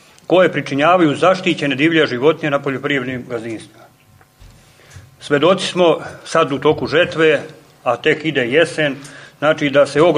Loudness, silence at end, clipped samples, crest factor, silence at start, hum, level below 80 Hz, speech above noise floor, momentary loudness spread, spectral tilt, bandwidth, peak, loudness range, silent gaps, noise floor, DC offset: -16 LUFS; 0 s; under 0.1%; 16 dB; 0.3 s; none; -56 dBFS; 34 dB; 11 LU; -5.5 dB/octave; 11.5 kHz; 0 dBFS; 6 LU; none; -50 dBFS; under 0.1%